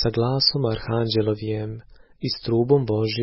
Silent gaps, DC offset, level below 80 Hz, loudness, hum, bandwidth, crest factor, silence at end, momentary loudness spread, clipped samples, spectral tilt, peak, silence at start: none; under 0.1%; -46 dBFS; -22 LUFS; none; 5.8 kHz; 16 dB; 0 s; 11 LU; under 0.1%; -9.5 dB/octave; -6 dBFS; 0 s